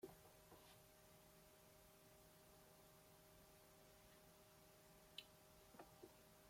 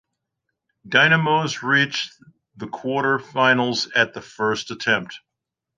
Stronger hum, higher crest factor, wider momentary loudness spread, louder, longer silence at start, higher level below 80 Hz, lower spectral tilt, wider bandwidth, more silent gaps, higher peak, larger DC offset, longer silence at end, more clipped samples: neither; first, 30 dB vs 20 dB; second, 8 LU vs 14 LU; second, -66 LUFS vs -20 LUFS; second, 0 s vs 0.85 s; second, -80 dBFS vs -66 dBFS; about the same, -3.5 dB/octave vs -4 dB/octave; first, 16.5 kHz vs 9.6 kHz; neither; second, -38 dBFS vs -2 dBFS; neither; second, 0 s vs 0.6 s; neither